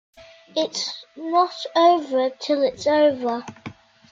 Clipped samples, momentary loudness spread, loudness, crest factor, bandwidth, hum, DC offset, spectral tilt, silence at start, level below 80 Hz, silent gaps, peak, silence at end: under 0.1%; 15 LU; -21 LUFS; 16 dB; 7.8 kHz; none; under 0.1%; -3.5 dB/octave; 0.2 s; -66 dBFS; none; -6 dBFS; 0.4 s